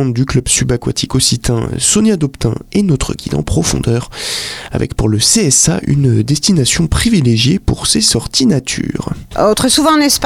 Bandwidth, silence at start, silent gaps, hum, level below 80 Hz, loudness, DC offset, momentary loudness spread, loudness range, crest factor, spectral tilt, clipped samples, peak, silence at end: 16.5 kHz; 0 s; none; none; -28 dBFS; -12 LUFS; under 0.1%; 9 LU; 3 LU; 12 dB; -4 dB/octave; under 0.1%; -2 dBFS; 0 s